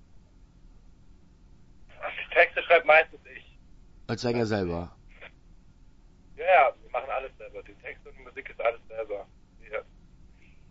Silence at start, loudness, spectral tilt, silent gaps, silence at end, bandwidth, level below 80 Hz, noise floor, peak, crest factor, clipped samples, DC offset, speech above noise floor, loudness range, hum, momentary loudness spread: 2 s; -26 LUFS; -5.5 dB/octave; none; 0.9 s; 8 kHz; -54 dBFS; -54 dBFS; -6 dBFS; 24 dB; under 0.1%; under 0.1%; 26 dB; 11 LU; none; 24 LU